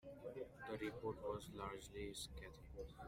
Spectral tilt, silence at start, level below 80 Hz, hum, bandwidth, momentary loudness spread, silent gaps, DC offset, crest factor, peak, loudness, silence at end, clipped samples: -4.5 dB/octave; 0.05 s; -62 dBFS; none; 16 kHz; 9 LU; none; under 0.1%; 18 dB; -32 dBFS; -51 LUFS; 0 s; under 0.1%